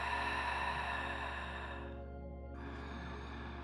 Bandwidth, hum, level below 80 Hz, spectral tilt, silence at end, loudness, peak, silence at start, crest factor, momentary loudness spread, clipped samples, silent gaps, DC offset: 12 kHz; none; -50 dBFS; -5 dB/octave; 0 s; -41 LUFS; -26 dBFS; 0 s; 16 dB; 12 LU; under 0.1%; none; under 0.1%